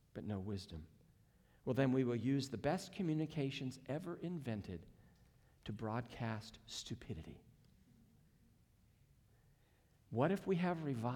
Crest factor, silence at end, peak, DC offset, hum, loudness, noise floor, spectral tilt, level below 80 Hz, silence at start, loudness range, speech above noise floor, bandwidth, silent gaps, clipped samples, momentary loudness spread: 20 dB; 0 s; -22 dBFS; under 0.1%; none; -41 LUFS; -72 dBFS; -6.5 dB/octave; -68 dBFS; 0.15 s; 14 LU; 31 dB; 18 kHz; none; under 0.1%; 14 LU